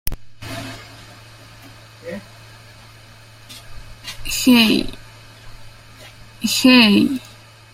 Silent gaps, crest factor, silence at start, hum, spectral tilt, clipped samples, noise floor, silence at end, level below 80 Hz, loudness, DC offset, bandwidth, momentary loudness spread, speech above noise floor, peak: none; 20 dB; 0.05 s; none; -3.5 dB/octave; under 0.1%; -43 dBFS; 0.5 s; -40 dBFS; -14 LUFS; under 0.1%; 16 kHz; 27 LU; 29 dB; 0 dBFS